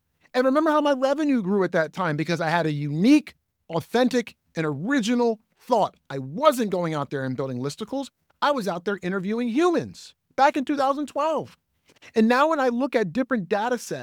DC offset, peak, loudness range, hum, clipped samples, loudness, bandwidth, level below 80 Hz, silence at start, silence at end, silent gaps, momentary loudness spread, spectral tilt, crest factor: under 0.1%; -2 dBFS; 3 LU; none; under 0.1%; -24 LUFS; 18 kHz; -68 dBFS; 0.35 s; 0 s; none; 11 LU; -6 dB/octave; 22 dB